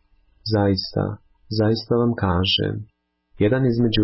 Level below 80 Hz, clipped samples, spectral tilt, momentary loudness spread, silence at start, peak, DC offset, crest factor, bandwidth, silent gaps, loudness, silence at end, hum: -40 dBFS; under 0.1%; -10.5 dB/octave; 10 LU; 0.45 s; -8 dBFS; under 0.1%; 12 dB; 5.8 kHz; none; -21 LUFS; 0 s; none